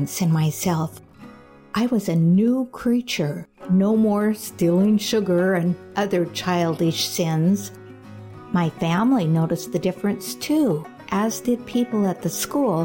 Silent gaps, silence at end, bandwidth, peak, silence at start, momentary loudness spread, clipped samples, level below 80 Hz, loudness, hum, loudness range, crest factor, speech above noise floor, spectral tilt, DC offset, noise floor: none; 0 s; 17 kHz; -10 dBFS; 0 s; 9 LU; under 0.1%; -58 dBFS; -22 LUFS; none; 3 LU; 10 dB; 24 dB; -6 dB/octave; under 0.1%; -45 dBFS